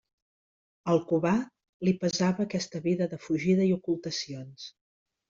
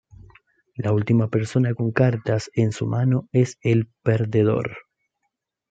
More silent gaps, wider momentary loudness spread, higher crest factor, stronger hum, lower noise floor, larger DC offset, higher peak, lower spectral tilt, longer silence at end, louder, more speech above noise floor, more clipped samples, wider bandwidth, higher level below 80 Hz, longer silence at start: first, 1.69-1.80 s vs none; first, 15 LU vs 6 LU; about the same, 16 dB vs 18 dB; neither; first, under -90 dBFS vs -77 dBFS; neither; second, -12 dBFS vs -4 dBFS; second, -6 dB/octave vs -8 dB/octave; second, 0.6 s vs 0.9 s; second, -29 LUFS vs -22 LUFS; first, over 62 dB vs 57 dB; neither; about the same, 7.6 kHz vs 8 kHz; second, -68 dBFS vs -58 dBFS; first, 0.85 s vs 0.2 s